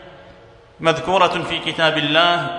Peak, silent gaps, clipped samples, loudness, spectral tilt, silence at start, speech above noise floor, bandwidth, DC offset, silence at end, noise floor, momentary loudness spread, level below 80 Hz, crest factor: 0 dBFS; none; under 0.1%; -17 LUFS; -4 dB/octave; 0 s; 28 dB; 10.5 kHz; under 0.1%; 0 s; -45 dBFS; 7 LU; -52 dBFS; 18 dB